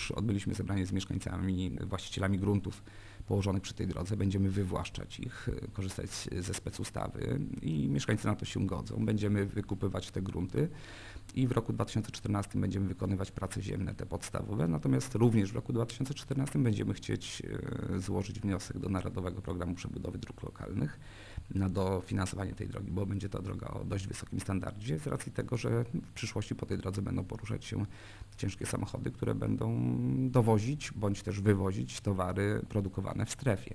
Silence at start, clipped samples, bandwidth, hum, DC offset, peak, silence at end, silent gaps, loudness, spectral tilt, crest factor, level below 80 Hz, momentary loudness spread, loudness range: 0 s; under 0.1%; 11 kHz; none; under 0.1%; -14 dBFS; 0 s; none; -35 LUFS; -6.5 dB/octave; 20 dB; -50 dBFS; 8 LU; 5 LU